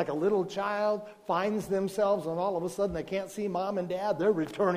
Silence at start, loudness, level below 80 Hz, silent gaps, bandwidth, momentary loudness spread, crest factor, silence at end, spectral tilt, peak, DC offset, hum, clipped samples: 0 s; -30 LUFS; -60 dBFS; none; 15.5 kHz; 5 LU; 16 dB; 0 s; -6 dB/octave; -14 dBFS; under 0.1%; none; under 0.1%